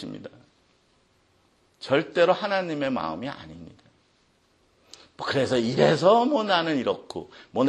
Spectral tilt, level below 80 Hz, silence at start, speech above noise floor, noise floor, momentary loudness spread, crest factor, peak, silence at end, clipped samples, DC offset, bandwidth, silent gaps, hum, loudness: -5.5 dB/octave; -64 dBFS; 0 s; 41 dB; -65 dBFS; 22 LU; 20 dB; -6 dBFS; 0 s; under 0.1%; under 0.1%; 10.5 kHz; none; none; -24 LUFS